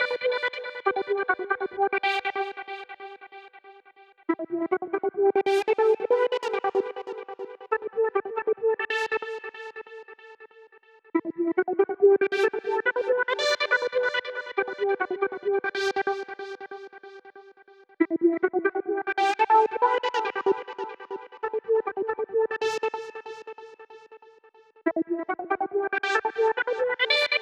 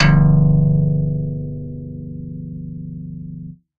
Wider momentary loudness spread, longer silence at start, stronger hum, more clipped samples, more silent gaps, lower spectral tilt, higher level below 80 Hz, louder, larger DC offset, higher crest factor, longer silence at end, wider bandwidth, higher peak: about the same, 17 LU vs 19 LU; about the same, 0 s vs 0 s; second, none vs 50 Hz at -50 dBFS; neither; neither; second, -3 dB/octave vs -8.5 dB/octave; second, -76 dBFS vs -30 dBFS; second, -26 LUFS vs -16 LUFS; neither; about the same, 18 dB vs 16 dB; second, 0 s vs 0.25 s; first, 10 kHz vs 5.2 kHz; second, -8 dBFS vs -2 dBFS